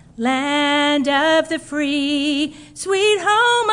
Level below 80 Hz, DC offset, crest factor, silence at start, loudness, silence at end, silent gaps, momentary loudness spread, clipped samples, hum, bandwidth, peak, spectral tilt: -56 dBFS; under 0.1%; 12 dB; 0.2 s; -17 LUFS; 0 s; none; 8 LU; under 0.1%; none; 11 kHz; -6 dBFS; -2.5 dB/octave